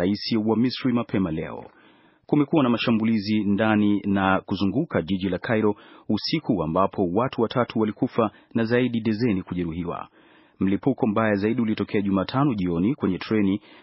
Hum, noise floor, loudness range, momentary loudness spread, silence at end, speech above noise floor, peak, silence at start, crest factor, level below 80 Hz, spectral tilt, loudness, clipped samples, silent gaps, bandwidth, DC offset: none; -56 dBFS; 3 LU; 7 LU; 0.25 s; 33 dB; -4 dBFS; 0 s; 18 dB; -56 dBFS; -5.5 dB/octave; -24 LUFS; under 0.1%; none; 5.8 kHz; under 0.1%